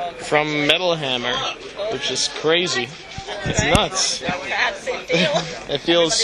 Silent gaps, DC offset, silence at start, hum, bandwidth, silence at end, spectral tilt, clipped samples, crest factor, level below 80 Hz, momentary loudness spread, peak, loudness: none; under 0.1%; 0 s; none; 12 kHz; 0 s; -3 dB/octave; under 0.1%; 20 dB; -42 dBFS; 10 LU; 0 dBFS; -20 LUFS